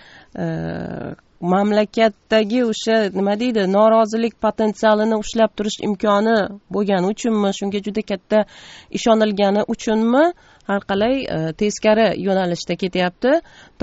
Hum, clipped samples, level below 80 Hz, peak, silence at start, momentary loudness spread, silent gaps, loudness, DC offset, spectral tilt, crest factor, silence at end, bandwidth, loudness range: none; under 0.1%; -50 dBFS; -2 dBFS; 0.35 s; 9 LU; none; -19 LUFS; under 0.1%; -4.5 dB/octave; 16 dB; 0.45 s; 8 kHz; 2 LU